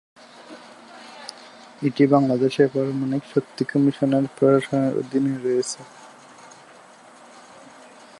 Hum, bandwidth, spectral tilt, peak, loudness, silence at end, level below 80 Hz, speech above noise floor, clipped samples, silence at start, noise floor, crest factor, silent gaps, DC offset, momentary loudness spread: none; 11.5 kHz; -6.5 dB/octave; -4 dBFS; -21 LUFS; 2.15 s; -70 dBFS; 27 dB; under 0.1%; 0.4 s; -48 dBFS; 20 dB; none; under 0.1%; 24 LU